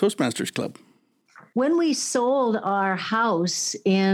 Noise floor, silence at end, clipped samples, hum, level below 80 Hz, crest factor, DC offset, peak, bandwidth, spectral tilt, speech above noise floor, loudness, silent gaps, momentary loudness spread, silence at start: -58 dBFS; 0 s; under 0.1%; none; -82 dBFS; 14 dB; under 0.1%; -8 dBFS; 16.5 kHz; -4 dB/octave; 36 dB; -23 LUFS; none; 7 LU; 0 s